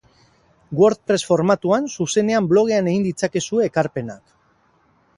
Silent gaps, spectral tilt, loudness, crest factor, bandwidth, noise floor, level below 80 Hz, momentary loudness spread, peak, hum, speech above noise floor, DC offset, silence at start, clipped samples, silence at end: none; -5.5 dB/octave; -19 LUFS; 18 dB; 11.5 kHz; -60 dBFS; -58 dBFS; 7 LU; -2 dBFS; none; 41 dB; under 0.1%; 0.7 s; under 0.1%; 1 s